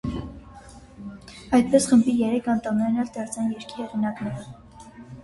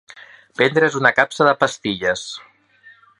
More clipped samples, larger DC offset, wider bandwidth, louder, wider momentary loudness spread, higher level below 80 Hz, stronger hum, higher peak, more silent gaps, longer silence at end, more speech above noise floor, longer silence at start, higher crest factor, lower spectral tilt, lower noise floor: neither; neither; about the same, 11.5 kHz vs 11.5 kHz; second, -23 LUFS vs -17 LUFS; first, 23 LU vs 16 LU; first, -48 dBFS vs -60 dBFS; neither; second, -6 dBFS vs 0 dBFS; neither; second, 0 s vs 0.8 s; second, 23 dB vs 32 dB; about the same, 0.05 s vs 0.15 s; about the same, 20 dB vs 20 dB; first, -5.5 dB/octave vs -4 dB/octave; second, -45 dBFS vs -50 dBFS